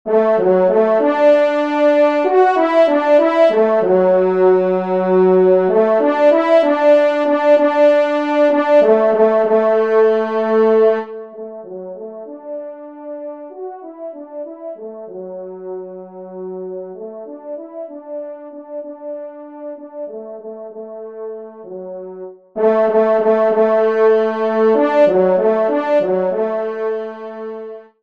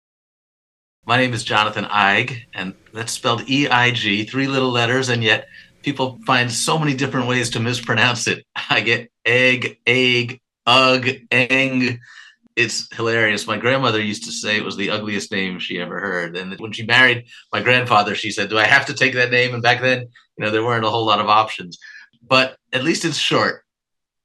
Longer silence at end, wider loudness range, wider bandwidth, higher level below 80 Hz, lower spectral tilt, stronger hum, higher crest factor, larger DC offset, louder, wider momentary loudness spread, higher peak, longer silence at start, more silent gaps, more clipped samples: second, 0.2 s vs 0.7 s; first, 17 LU vs 4 LU; second, 7 kHz vs 12.5 kHz; second, -68 dBFS vs -62 dBFS; first, -7.5 dB/octave vs -3.5 dB/octave; neither; second, 14 dB vs 20 dB; first, 0.2% vs under 0.1%; first, -14 LUFS vs -17 LUFS; first, 19 LU vs 11 LU; about the same, 0 dBFS vs 0 dBFS; second, 0.05 s vs 1.05 s; neither; neither